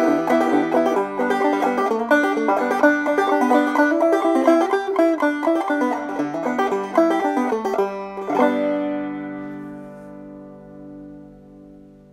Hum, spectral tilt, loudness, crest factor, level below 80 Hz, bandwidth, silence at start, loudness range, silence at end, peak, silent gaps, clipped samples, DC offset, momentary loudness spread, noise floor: none; -5.5 dB/octave; -19 LUFS; 18 dB; -62 dBFS; 15 kHz; 0 s; 8 LU; 0.35 s; -2 dBFS; none; under 0.1%; under 0.1%; 21 LU; -45 dBFS